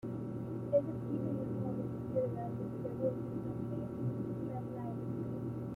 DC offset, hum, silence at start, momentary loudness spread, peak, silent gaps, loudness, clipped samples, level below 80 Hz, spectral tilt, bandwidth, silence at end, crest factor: under 0.1%; none; 0.05 s; 7 LU; -20 dBFS; none; -39 LUFS; under 0.1%; -62 dBFS; -11 dB/octave; 4 kHz; 0 s; 18 dB